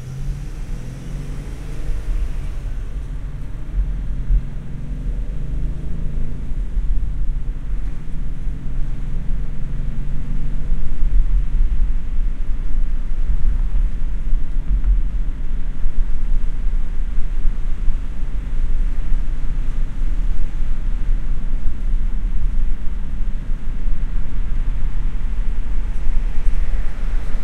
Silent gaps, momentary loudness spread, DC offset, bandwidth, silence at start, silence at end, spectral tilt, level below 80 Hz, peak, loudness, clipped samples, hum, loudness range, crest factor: none; 6 LU; under 0.1%; 3 kHz; 0 s; 0 s; -7.5 dB/octave; -18 dBFS; -2 dBFS; -27 LUFS; under 0.1%; none; 3 LU; 14 dB